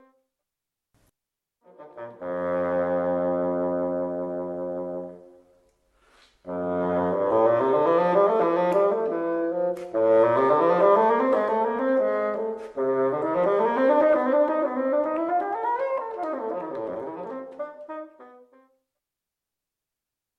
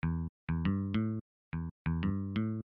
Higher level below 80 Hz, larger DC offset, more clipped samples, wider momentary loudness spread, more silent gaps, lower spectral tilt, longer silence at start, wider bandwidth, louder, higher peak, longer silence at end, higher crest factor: second, -68 dBFS vs -48 dBFS; neither; neither; first, 15 LU vs 8 LU; second, none vs 0.29-0.47 s, 1.21-1.51 s, 1.71-1.85 s; second, -8 dB/octave vs -10.5 dB/octave; first, 1.8 s vs 0.05 s; first, 6.2 kHz vs 5.2 kHz; first, -24 LUFS vs -36 LUFS; first, -6 dBFS vs -22 dBFS; first, 2.1 s vs 0.1 s; first, 18 dB vs 12 dB